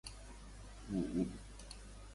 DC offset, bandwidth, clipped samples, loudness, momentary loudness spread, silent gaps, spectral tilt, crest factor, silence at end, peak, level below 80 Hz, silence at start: under 0.1%; 11.5 kHz; under 0.1%; -43 LUFS; 16 LU; none; -6 dB/octave; 18 dB; 0 s; -26 dBFS; -54 dBFS; 0.05 s